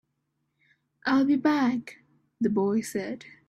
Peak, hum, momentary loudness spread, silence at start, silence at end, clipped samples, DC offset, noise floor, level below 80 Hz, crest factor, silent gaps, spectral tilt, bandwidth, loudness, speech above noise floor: -12 dBFS; none; 11 LU; 1.05 s; 0.2 s; under 0.1%; under 0.1%; -78 dBFS; -68 dBFS; 16 dB; none; -5.5 dB/octave; 13.5 kHz; -26 LUFS; 52 dB